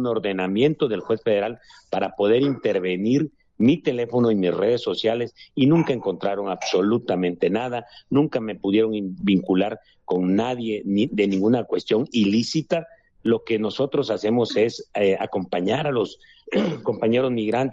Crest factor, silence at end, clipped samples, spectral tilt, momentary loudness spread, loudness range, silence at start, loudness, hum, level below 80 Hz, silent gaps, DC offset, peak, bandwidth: 14 dB; 0 s; under 0.1%; -6.5 dB/octave; 7 LU; 2 LU; 0 s; -22 LUFS; none; -62 dBFS; none; under 0.1%; -8 dBFS; 7.8 kHz